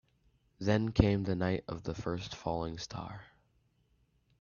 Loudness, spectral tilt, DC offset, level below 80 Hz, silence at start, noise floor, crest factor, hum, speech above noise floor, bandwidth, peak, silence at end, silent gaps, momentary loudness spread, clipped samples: -34 LUFS; -7 dB/octave; under 0.1%; -52 dBFS; 0.6 s; -73 dBFS; 26 dB; none; 40 dB; 7.2 kHz; -8 dBFS; 1.15 s; none; 13 LU; under 0.1%